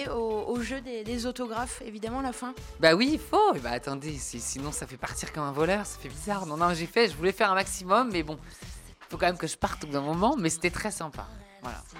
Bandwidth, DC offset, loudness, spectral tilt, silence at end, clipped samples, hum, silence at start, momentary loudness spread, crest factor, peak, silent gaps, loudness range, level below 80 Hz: 16.5 kHz; under 0.1%; -28 LUFS; -4 dB/octave; 0 s; under 0.1%; none; 0 s; 15 LU; 22 dB; -8 dBFS; none; 3 LU; -48 dBFS